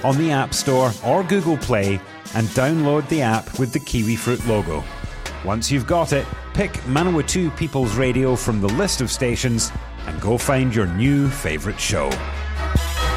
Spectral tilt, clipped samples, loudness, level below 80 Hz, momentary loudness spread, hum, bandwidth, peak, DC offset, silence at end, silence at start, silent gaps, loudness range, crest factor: -5 dB/octave; under 0.1%; -20 LUFS; -32 dBFS; 8 LU; none; 16 kHz; -4 dBFS; under 0.1%; 0 s; 0 s; none; 2 LU; 16 dB